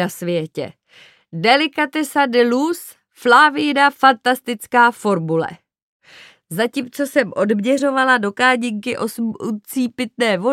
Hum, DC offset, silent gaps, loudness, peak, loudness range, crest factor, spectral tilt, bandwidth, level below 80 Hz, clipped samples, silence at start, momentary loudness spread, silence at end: none; under 0.1%; 5.82-6.00 s; -17 LUFS; 0 dBFS; 4 LU; 18 dB; -4.5 dB/octave; 16.5 kHz; -70 dBFS; under 0.1%; 0 s; 11 LU; 0 s